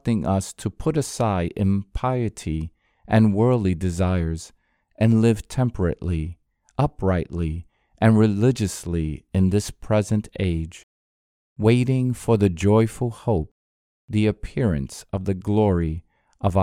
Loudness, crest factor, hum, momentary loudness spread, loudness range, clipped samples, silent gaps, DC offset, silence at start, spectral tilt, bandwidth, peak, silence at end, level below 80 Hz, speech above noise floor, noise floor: -22 LUFS; 20 dB; none; 11 LU; 2 LU; under 0.1%; 10.83-11.56 s, 13.51-14.08 s; under 0.1%; 0.05 s; -7.5 dB/octave; 14 kHz; -2 dBFS; 0 s; -40 dBFS; over 69 dB; under -90 dBFS